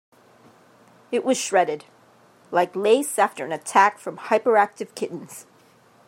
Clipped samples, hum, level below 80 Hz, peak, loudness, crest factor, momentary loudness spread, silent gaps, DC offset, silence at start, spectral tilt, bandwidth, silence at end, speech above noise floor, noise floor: under 0.1%; none; -82 dBFS; -2 dBFS; -22 LUFS; 22 dB; 16 LU; none; under 0.1%; 1.1 s; -3 dB/octave; 16 kHz; 0.65 s; 34 dB; -55 dBFS